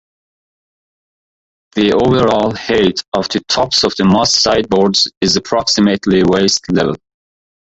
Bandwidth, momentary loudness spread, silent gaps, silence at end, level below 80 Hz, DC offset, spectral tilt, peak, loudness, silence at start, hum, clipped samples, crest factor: 8.2 kHz; 6 LU; 3.08-3.12 s, 5.17-5.21 s; 0.75 s; -42 dBFS; under 0.1%; -4 dB/octave; 0 dBFS; -13 LUFS; 1.75 s; none; under 0.1%; 14 dB